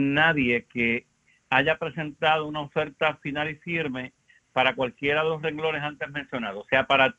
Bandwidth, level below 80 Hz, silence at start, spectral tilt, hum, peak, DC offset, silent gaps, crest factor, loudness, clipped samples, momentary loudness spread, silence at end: 8 kHz; -58 dBFS; 0 s; -6.5 dB/octave; none; -4 dBFS; under 0.1%; none; 22 dB; -25 LUFS; under 0.1%; 11 LU; 0.05 s